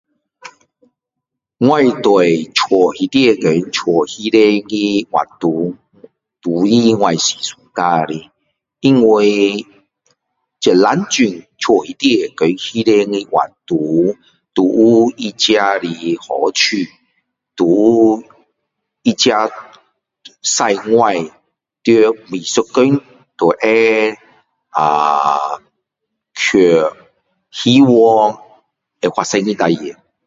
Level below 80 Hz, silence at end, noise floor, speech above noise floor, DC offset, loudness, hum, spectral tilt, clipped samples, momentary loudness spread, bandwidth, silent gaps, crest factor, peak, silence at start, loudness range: -58 dBFS; 0.35 s; -80 dBFS; 67 dB; under 0.1%; -14 LUFS; none; -4.5 dB/octave; under 0.1%; 11 LU; 7.8 kHz; none; 14 dB; 0 dBFS; 0.45 s; 2 LU